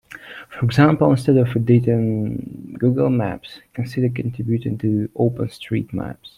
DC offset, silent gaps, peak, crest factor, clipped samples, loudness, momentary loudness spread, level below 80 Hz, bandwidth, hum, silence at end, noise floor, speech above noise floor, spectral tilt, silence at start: under 0.1%; none; -2 dBFS; 16 dB; under 0.1%; -20 LUFS; 15 LU; -50 dBFS; 12 kHz; none; 0.1 s; -39 dBFS; 20 dB; -8.5 dB/octave; 0.1 s